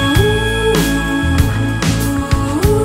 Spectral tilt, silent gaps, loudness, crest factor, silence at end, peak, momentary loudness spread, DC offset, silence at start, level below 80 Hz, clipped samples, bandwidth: -5.5 dB/octave; none; -15 LUFS; 14 dB; 0 s; 0 dBFS; 3 LU; under 0.1%; 0 s; -22 dBFS; under 0.1%; 16.5 kHz